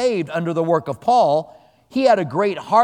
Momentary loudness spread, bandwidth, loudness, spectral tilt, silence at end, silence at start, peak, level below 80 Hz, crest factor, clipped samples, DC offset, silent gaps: 7 LU; 10.5 kHz; -19 LUFS; -6 dB/octave; 0 s; 0 s; -2 dBFS; -64 dBFS; 16 dB; under 0.1%; under 0.1%; none